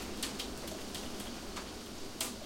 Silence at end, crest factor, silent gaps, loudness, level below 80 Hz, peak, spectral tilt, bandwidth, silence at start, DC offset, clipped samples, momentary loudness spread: 0 s; 22 dB; none; -41 LUFS; -54 dBFS; -20 dBFS; -2.5 dB/octave; 17 kHz; 0 s; under 0.1%; under 0.1%; 6 LU